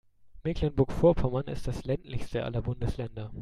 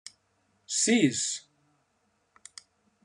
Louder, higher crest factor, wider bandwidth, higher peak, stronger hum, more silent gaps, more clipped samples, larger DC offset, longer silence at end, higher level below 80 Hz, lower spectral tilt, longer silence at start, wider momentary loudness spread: second, -30 LUFS vs -26 LUFS; about the same, 18 dB vs 22 dB; about the same, 12.5 kHz vs 12 kHz; about the same, -10 dBFS vs -10 dBFS; neither; neither; neither; neither; second, 0 s vs 1.65 s; first, -40 dBFS vs -78 dBFS; first, -8 dB/octave vs -3 dB/octave; second, 0.25 s vs 0.7 s; second, 11 LU vs 25 LU